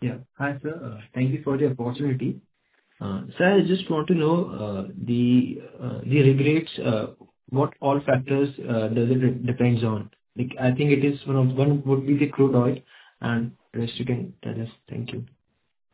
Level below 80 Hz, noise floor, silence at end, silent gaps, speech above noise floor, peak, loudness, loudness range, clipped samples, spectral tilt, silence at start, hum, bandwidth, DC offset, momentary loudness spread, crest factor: -58 dBFS; -67 dBFS; 0.65 s; none; 43 dB; -4 dBFS; -24 LUFS; 4 LU; under 0.1%; -12 dB/octave; 0 s; none; 4 kHz; under 0.1%; 13 LU; 18 dB